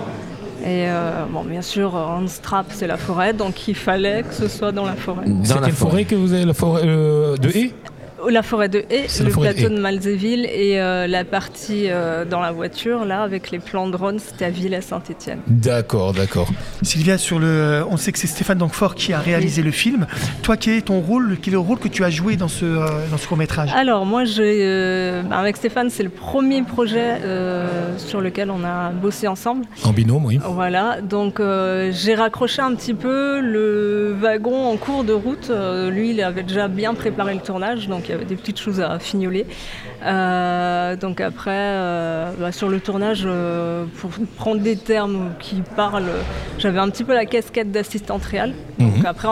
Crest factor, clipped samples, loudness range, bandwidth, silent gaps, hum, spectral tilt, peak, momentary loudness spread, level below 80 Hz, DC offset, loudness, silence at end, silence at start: 18 dB; under 0.1%; 4 LU; 16 kHz; none; none; -5.5 dB/octave; -2 dBFS; 8 LU; -42 dBFS; under 0.1%; -20 LUFS; 0 s; 0 s